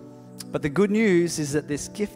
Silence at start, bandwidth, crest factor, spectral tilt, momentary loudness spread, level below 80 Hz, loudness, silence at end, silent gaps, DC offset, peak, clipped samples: 0 s; 16 kHz; 14 dB; -5.5 dB/octave; 12 LU; -54 dBFS; -24 LUFS; 0 s; none; under 0.1%; -10 dBFS; under 0.1%